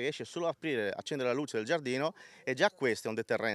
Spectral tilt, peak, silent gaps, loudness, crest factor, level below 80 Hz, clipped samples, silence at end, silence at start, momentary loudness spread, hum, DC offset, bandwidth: -4.5 dB/octave; -12 dBFS; none; -34 LUFS; 20 dB; -88 dBFS; under 0.1%; 0 s; 0 s; 6 LU; none; under 0.1%; 13.5 kHz